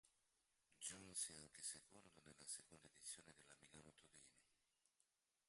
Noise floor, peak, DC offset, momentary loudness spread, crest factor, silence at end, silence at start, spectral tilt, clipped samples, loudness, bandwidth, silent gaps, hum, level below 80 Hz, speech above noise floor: -88 dBFS; -36 dBFS; under 0.1%; 18 LU; 26 dB; 1.05 s; 0.05 s; -0.5 dB/octave; under 0.1%; -54 LUFS; 11.5 kHz; none; none; -88 dBFS; 28 dB